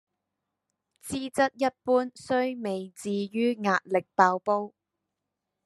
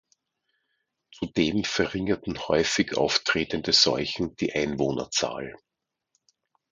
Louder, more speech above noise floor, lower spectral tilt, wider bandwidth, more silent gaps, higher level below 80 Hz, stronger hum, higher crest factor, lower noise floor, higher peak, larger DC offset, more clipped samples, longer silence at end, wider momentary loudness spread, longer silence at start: about the same, -27 LUFS vs -25 LUFS; first, 58 dB vs 52 dB; first, -5 dB/octave vs -3.5 dB/octave; first, 13 kHz vs 9.6 kHz; neither; second, -72 dBFS vs -54 dBFS; neither; about the same, 24 dB vs 22 dB; first, -85 dBFS vs -78 dBFS; about the same, -4 dBFS vs -6 dBFS; neither; neither; second, 0.95 s vs 1.2 s; about the same, 11 LU vs 10 LU; second, 1.05 s vs 1.2 s